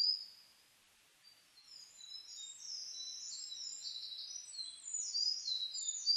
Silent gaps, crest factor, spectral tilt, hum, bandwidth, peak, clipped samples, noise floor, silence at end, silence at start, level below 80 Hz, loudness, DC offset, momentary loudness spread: none; 20 dB; 4.5 dB/octave; none; 14 kHz; -24 dBFS; under 0.1%; -69 dBFS; 0 s; 0 s; under -90 dBFS; -40 LUFS; under 0.1%; 20 LU